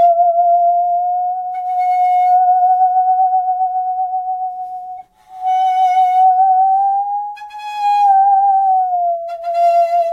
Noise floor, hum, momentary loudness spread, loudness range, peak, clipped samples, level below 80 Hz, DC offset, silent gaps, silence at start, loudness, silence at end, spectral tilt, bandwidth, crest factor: -34 dBFS; none; 12 LU; 3 LU; -4 dBFS; under 0.1%; -66 dBFS; under 0.1%; none; 0 s; -14 LUFS; 0 s; -1 dB/octave; 6.4 kHz; 10 dB